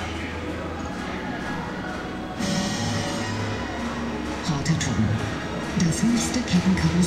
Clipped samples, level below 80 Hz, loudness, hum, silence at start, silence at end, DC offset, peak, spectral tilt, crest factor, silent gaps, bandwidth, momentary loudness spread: under 0.1%; -40 dBFS; -26 LUFS; none; 0 s; 0 s; 0.1%; -10 dBFS; -5 dB/octave; 16 dB; none; 14.5 kHz; 9 LU